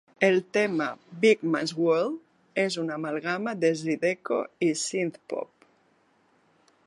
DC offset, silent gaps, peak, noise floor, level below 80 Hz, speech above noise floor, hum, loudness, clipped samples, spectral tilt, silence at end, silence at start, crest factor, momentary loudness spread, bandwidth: under 0.1%; none; -6 dBFS; -65 dBFS; -78 dBFS; 39 dB; none; -27 LUFS; under 0.1%; -4.5 dB/octave; 1.4 s; 0.2 s; 22 dB; 11 LU; 11.5 kHz